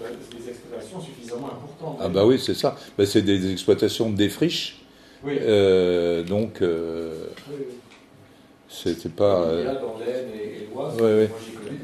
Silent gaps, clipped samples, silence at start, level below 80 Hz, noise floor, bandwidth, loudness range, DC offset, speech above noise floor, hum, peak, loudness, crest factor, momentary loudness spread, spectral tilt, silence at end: none; under 0.1%; 0 s; -58 dBFS; -51 dBFS; 13.5 kHz; 5 LU; under 0.1%; 28 dB; none; -6 dBFS; -23 LUFS; 18 dB; 17 LU; -5.5 dB/octave; 0 s